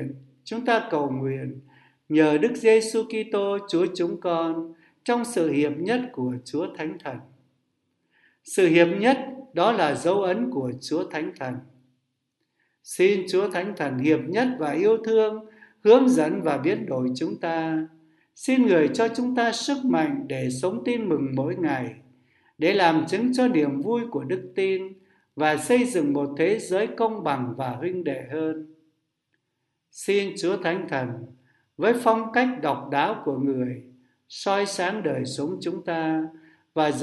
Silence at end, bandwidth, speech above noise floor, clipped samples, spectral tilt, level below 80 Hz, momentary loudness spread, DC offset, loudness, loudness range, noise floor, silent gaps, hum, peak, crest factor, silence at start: 0 s; 12 kHz; 54 dB; under 0.1%; -5.5 dB/octave; -72 dBFS; 12 LU; under 0.1%; -24 LUFS; 6 LU; -78 dBFS; none; none; -4 dBFS; 22 dB; 0 s